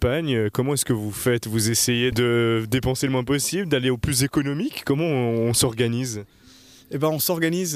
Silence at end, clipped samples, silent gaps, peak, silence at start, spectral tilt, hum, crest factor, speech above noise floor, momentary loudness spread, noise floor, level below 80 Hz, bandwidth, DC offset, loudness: 0 s; under 0.1%; none; -6 dBFS; 0 s; -4.5 dB/octave; none; 16 dB; 28 dB; 5 LU; -50 dBFS; -44 dBFS; 15.5 kHz; under 0.1%; -22 LUFS